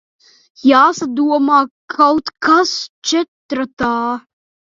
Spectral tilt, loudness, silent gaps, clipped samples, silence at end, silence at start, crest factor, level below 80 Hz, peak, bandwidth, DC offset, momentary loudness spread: -3 dB/octave; -15 LUFS; 1.71-1.88 s, 2.89-3.02 s, 3.28-3.49 s, 3.73-3.77 s; under 0.1%; 0.5 s; 0.65 s; 16 dB; -54 dBFS; 0 dBFS; 7.6 kHz; under 0.1%; 11 LU